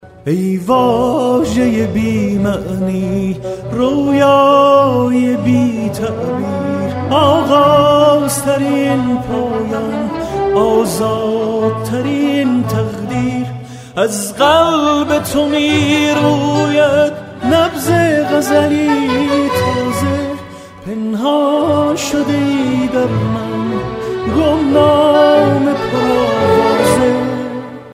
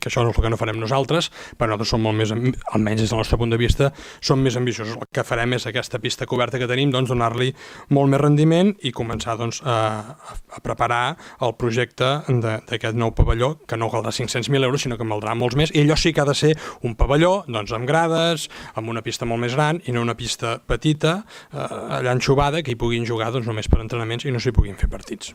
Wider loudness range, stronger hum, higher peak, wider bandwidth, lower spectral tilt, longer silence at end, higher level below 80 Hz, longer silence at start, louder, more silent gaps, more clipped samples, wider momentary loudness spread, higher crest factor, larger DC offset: about the same, 3 LU vs 3 LU; neither; about the same, 0 dBFS vs 0 dBFS; about the same, 16 kHz vs 15.5 kHz; about the same, -5.5 dB/octave vs -5.5 dB/octave; about the same, 0 s vs 0 s; second, -40 dBFS vs -32 dBFS; about the same, 0.05 s vs 0 s; first, -13 LUFS vs -21 LUFS; neither; neither; about the same, 10 LU vs 9 LU; second, 12 dB vs 20 dB; neither